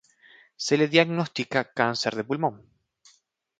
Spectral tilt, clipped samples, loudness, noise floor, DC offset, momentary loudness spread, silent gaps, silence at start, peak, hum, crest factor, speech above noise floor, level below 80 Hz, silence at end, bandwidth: -4.5 dB/octave; under 0.1%; -25 LUFS; -65 dBFS; under 0.1%; 8 LU; none; 0.6 s; -4 dBFS; none; 22 dB; 41 dB; -70 dBFS; 1 s; 9.4 kHz